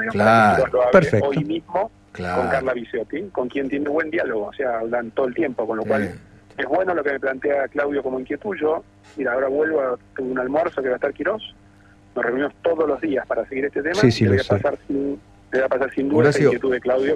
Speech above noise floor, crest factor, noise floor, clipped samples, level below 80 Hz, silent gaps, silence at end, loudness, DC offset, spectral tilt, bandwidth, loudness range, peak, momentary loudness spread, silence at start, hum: 29 dB; 20 dB; -50 dBFS; under 0.1%; -52 dBFS; none; 0 s; -21 LUFS; under 0.1%; -7 dB/octave; 12 kHz; 4 LU; -2 dBFS; 12 LU; 0 s; none